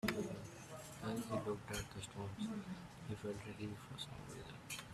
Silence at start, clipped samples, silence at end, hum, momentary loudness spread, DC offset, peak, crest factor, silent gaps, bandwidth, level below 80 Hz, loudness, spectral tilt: 0.05 s; under 0.1%; 0 s; none; 10 LU; under 0.1%; -22 dBFS; 24 dB; none; 15.5 kHz; -66 dBFS; -47 LUFS; -5 dB/octave